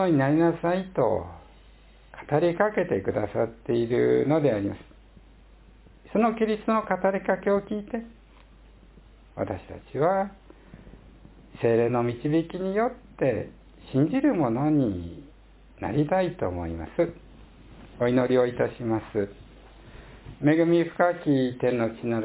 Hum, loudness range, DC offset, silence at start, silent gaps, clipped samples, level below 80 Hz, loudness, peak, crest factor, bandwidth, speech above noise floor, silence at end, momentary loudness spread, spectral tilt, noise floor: none; 5 LU; under 0.1%; 0 s; none; under 0.1%; -50 dBFS; -26 LUFS; -8 dBFS; 18 dB; 4 kHz; 28 dB; 0 s; 12 LU; -11.5 dB/octave; -52 dBFS